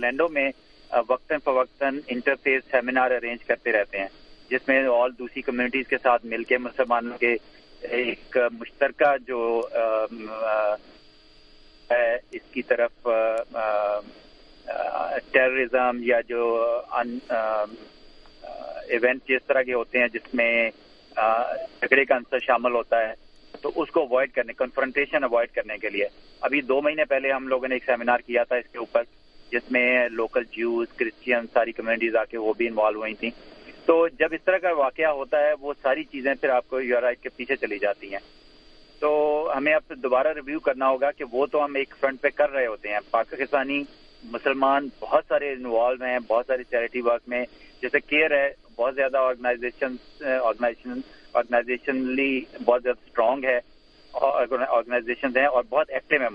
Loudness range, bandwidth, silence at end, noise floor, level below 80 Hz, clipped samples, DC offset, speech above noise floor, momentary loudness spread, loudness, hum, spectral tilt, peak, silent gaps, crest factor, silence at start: 3 LU; 5.2 kHz; 0 s; -52 dBFS; -56 dBFS; under 0.1%; under 0.1%; 28 dB; 8 LU; -24 LUFS; none; -6 dB/octave; -2 dBFS; none; 22 dB; 0 s